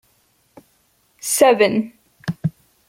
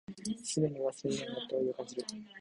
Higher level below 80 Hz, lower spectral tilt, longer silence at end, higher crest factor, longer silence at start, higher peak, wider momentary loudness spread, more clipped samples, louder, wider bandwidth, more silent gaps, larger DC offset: first, -62 dBFS vs -72 dBFS; about the same, -4 dB/octave vs -5 dB/octave; first, 0.4 s vs 0 s; about the same, 20 dB vs 18 dB; first, 1.25 s vs 0.1 s; first, -2 dBFS vs -18 dBFS; first, 17 LU vs 8 LU; neither; first, -18 LUFS vs -36 LUFS; first, 16.5 kHz vs 11.5 kHz; neither; neither